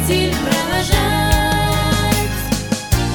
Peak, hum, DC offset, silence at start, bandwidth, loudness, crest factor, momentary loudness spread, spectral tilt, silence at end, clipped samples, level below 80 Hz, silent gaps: -2 dBFS; none; under 0.1%; 0 s; 19.5 kHz; -17 LUFS; 16 dB; 4 LU; -4.5 dB/octave; 0 s; under 0.1%; -24 dBFS; none